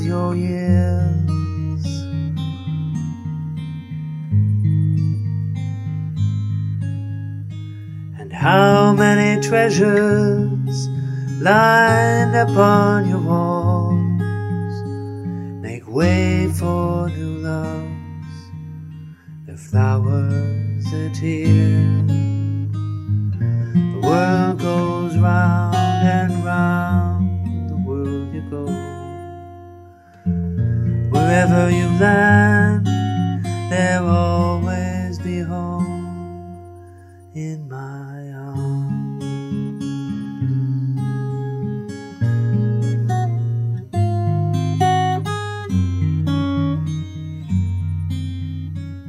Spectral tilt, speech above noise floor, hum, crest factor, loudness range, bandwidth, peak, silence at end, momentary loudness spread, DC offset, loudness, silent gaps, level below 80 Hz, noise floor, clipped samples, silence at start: -7 dB/octave; 28 dB; none; 18 dB; 10 LU; 12.5 kHz; 0 dBFS; 0 s; 16 LU; under 0.1%; -19 LUFS; none; -46 dBFS; -43 dBFS; under 0.1%; 0 s